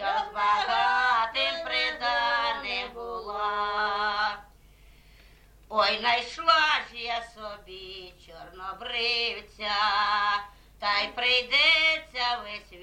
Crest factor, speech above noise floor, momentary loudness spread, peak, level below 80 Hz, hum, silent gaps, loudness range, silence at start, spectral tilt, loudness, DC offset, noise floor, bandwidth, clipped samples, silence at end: 18 dB; 27 dB; 18 LU; -8 dBFS; -56 dBFS; none; none; 6 LU; 0 s; -1.5 dB/octave; -25 LUFS; under 0.1%; -54 dBFS; 16 kHz; under 0.1%; 0 s